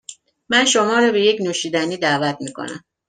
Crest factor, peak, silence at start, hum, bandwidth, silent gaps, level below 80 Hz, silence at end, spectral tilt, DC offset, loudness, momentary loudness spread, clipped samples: 18 dB; -2 dBFS; 0.1 s; none; 10 kHz; none; -64 dBFS; 0.3 s; -3 dB/octave; under 0.1%; -17 LUFS; 15 LU; under 0.1%